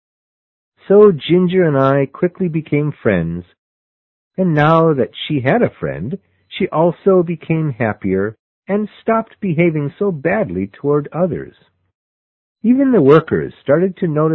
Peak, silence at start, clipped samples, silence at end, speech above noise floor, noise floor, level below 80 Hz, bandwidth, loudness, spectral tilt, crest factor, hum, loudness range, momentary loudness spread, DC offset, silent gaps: 0 dBFS; 0.9 s; under 0.1%; 0 s; over 75 dB; under -90 dBFS; -48 dBFS; 4.2 kHz; -16 LUFS; -10 dB/octave; 16 dB; none; 4 LU; 12 LU; under 0.1%; 3.58-4.31 s, 8.39-8.63 s, 11.95-12.56 s